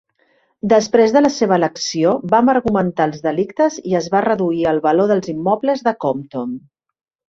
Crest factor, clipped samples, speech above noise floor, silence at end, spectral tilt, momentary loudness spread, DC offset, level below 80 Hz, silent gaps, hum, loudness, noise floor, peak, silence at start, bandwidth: 16 dB; under 0.1%; 44 dB; 0.7 s; -5.5 dB/octave; 8 LU; under 0.1%; -54 dBFS; none; none; -17 LUFS; -60 dBFS; -2 dBFS; 0.65 s; 7.8 kHz